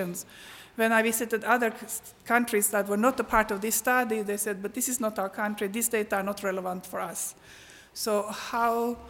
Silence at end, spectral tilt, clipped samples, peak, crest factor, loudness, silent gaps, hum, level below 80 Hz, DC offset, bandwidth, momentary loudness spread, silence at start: 0 s; -3 dB/octave; under 0.1%; -8 dBFS; 20 dB; -27 LUFS; none; none; -58 dBFS; under 0.1%; 17 kHz; 11 LU; 0 s